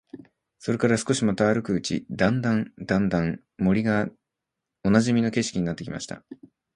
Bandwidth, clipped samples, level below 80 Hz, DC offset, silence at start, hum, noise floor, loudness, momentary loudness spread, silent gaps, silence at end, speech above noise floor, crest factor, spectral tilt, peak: 11 kHz; under 0.1%; -52 dBFS; under 0.1%; 0.15 s; none; -85 dBFS; -25 LUFS; 11 LU; none; 0.4 s; 61 dB; 20 dB; -6 dB/octave; -4 dBFS